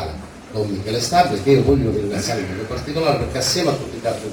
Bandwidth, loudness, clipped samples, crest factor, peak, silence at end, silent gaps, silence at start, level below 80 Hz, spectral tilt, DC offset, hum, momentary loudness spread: 19 kHz; -19 LUFS; under 0.1%; 18 dB; -2 dBFS; 0 s; none; 0 s; -38 dBFS; -5 dB/octave; under 0.1%; none; 11 LU